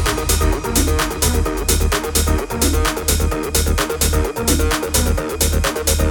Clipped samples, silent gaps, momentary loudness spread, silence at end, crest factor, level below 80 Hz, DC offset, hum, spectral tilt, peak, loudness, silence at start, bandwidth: under 0.1%; none; 2 LU; 0 s; 16 dB; -20 dBFS; under 0.1%; none; -3.5 dB/octave; -2 dBFS; -17 LUFS; 0 s; 19.5 kHz